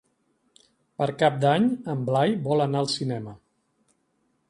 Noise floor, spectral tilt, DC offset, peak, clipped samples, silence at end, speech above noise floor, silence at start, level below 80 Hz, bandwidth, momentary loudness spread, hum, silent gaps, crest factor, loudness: -71 dBFS; -6.5 dB/octave; under 0.1%; -6 dBFS; under 0.1%; 1.15 s; 47 dB; 1 s; -68 dBFS; 11.5 kHz; 11 LU; none; none; 20 dB; -24 LUFS